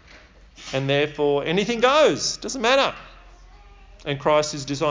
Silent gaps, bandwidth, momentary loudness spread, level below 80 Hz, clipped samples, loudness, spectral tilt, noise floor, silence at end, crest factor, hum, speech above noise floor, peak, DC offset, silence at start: none; 7.6 kHz; 13 LU; -50 dBFS; under 0.1%; -21 LUFS; -4 dB/octave; -48 dBFS; 0 s; 18 dB; none; 27 dB; -4 dBFS; under 0.1%; 0.15 s